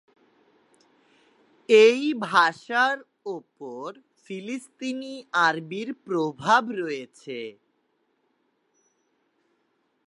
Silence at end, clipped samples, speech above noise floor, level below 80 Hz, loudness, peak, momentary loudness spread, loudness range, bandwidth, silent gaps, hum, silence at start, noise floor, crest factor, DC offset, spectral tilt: 2.55 s; under 0.1%; 47 dB; -78 dBFS; -23 LUFS; -4 dBFS; 19 LU; 7 LU; 11.5 kHz; none; none; 1.7 s; -72 dBFS; 22 dB; under 0.1%; -4 dB/octave